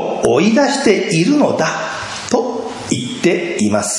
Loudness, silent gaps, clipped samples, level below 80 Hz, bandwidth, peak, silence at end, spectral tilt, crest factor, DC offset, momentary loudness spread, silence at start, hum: -15 LUFS; none; under 0.1%; -52 dBFS; 11.5 kHz; 0 dBFS; 0 s; -4.5 dB/octave; 14 dB; under 0.1%; 9 LU; 0 s; none